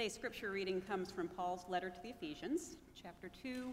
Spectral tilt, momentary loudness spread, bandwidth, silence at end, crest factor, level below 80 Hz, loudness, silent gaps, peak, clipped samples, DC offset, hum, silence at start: -4 dB/octave; 12 LU; 16 kHz; 0 s; 16 dB; -68 dBFS; -44 LUFS; none; -26 dBFS; under 0.1%; under 0.1%; none; 0 s